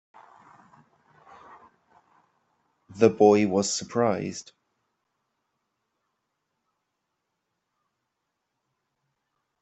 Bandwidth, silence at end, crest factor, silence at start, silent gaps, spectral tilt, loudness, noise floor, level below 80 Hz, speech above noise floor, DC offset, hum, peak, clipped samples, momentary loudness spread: 8.2 kHz; 5.2 s; 26 dB; 2.9 s; none; -5 dB/octave; -23 LUFS; -81 dBFS; -72 dBFS; 59 dB; under 0.1%; none; -4 dBFS; under 0.1%; 14 LU